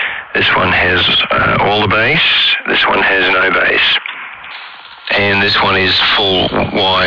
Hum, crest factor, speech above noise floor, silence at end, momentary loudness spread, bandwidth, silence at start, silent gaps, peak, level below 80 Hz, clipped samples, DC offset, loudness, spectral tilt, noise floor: none; 8 dB; 21 dB; 0 s; 15 LU; 5.4 kHz; 0 s; none; -4 dBFS; -40 dBFS; under 0.1%; under 0.1%; -10 LUFS; -5.5 dB/octave; -32 dBFS